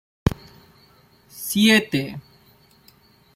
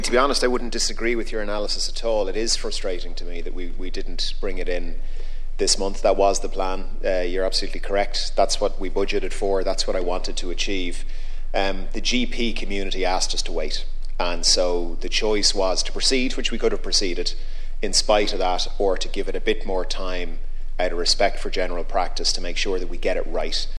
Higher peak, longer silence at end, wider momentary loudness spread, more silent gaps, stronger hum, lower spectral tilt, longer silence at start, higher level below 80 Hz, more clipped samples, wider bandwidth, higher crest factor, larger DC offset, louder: about the same, -2 dBFS vs -4 dBFS; first, 1.15 s vs 0 s; first, 21 LU vs 13 LU; neither; neither; first, -4 dB/octave vs -2.5 dB/octave; first, 0.25 s vs 0 s; second, -46 dBFS vs -24 dBFS; neither; first, 16.5 kHz vs 10.5 kHz; first, 22 dB vs 16 dB; neither; first, -20 LUFS vs -23 LUFS